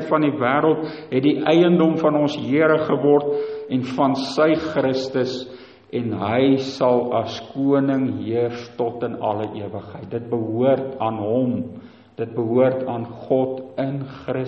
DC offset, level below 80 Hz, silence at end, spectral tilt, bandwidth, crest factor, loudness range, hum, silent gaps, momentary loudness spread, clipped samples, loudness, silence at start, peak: under 0.1%; -62 dBFS; 0 s; -7.5 dB/octave; 8.2 kHz; 16 dB; 5 LU; none; none; 11 LU; under 0.1%; -21 LUFS; 0 s; -4 dBFS